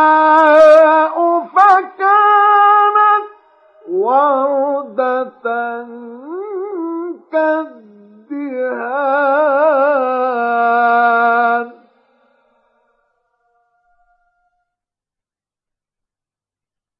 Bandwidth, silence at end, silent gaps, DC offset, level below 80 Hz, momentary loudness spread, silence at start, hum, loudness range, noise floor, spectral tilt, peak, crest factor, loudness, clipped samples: 7 kHz; 5.3 s; none; under 0.1%; -66 dBFS; 16 LU; 0 s; none; 11 LU; -89 dBFS; -4.5 dB/octave; 0 dBFS; 14 dB; -13 LUFS; under 0.1%